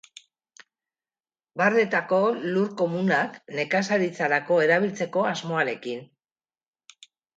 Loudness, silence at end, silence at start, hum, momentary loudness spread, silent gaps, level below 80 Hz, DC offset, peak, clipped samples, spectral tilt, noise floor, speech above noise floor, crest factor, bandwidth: -24 LUFS; 1.3 s; 1.55 s; none; 10 LU; none; -76 dBFS; under 0.1%; -6 dBFS; under 0.1%; -5.5 dB/octave; under -90 dBFS; over 66 dB; 20 dB; 9 kHz